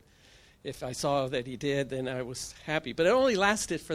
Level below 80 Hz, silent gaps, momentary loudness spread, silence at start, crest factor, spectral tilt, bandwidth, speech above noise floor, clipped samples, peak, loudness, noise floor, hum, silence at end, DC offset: -58 dBFS; none; 14 LU; 0.65 s; 22 dB; -4 dB/octave; 15.5 kHz; 29 dB; under 0.1%; -8 dBFS; -29 LUFS; -58 dBFS; none; 0 s; under 0.1%